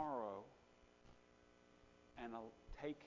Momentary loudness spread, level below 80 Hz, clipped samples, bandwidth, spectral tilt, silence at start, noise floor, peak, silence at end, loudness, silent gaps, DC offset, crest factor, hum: 22 LU; -70 dBFS; under 0.1%; 7.2 kHz; -5 dB/octave; 0 s; -70 dBFS; -32 dBFS; 0 s; -51 LUFS; none; under 0.1%; 20 dB; none